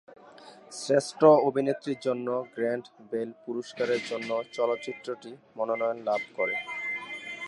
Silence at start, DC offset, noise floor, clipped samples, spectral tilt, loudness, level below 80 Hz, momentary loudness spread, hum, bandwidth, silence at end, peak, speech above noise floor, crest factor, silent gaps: 0.1 s; under 0.1%; -51 dBFS; under 0.1%; -5 dB/octave; -28 LUFS; -82 dBFS; 15 LU; none; 11.5 kHz; 0 s; -6 dBFS; 23 dB; 22 dB; none